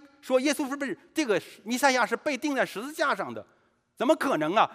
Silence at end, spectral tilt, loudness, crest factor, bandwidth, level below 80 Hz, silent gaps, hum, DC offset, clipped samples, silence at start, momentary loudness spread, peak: 0 s; -3.5 dB/octave; -27 LUFS; 20 dB; 16 kHz; -80 dBFS; none; none; under 0.1%; under 0.1%; 0.05 s; 8 LU; -6 dBFS